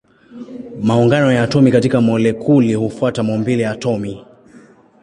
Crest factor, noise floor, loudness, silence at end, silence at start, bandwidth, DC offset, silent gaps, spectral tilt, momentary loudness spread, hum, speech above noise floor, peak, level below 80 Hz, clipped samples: 14 dB; -45 dBFS; -15 LUFS; 0.8 s; 0.3 s; 11 kHz; under 0.1%; none; -7.5 dB/octave; 19 LU; none; 31 dB; -2 dBFS; -50 dBFS; under 0.1%